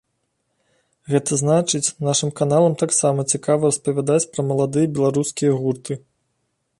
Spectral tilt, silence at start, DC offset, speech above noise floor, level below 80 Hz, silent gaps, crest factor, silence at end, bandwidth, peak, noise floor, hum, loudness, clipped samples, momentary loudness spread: -5 dB/octave; 1.1 s; under 0.1%; 53 dB; -62 dBFS; none; 16 dB; 0.8 s; 11.5 kHz; -4 dBFS; -72 dBFS; none; -19 LUFS; under 0.1%; 5 LU